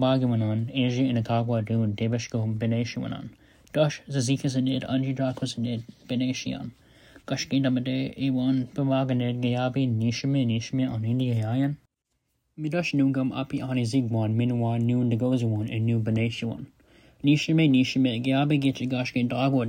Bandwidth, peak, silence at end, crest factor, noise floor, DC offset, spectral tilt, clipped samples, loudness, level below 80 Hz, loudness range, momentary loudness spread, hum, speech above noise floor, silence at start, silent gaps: 10.5 kHz; -10 dBFS; 0 s; 14 dB; -77 dBFS; under 0.1%; -6.5 dB/octave; under 0.1%; -26 LUFS; -60 dBFS; 4 LU; 8 LU; none; 52 dB; 0 s; none